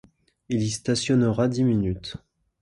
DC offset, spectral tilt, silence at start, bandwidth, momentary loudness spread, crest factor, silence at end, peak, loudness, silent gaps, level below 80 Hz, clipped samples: under 0.1%; -6 dB/octave; 0.5 s; 11.5 kHz; 13 LU; 16 dB; 0.45 s; -8 dBFS; -24 LUFS; none; -48 dBFS; under 0.1%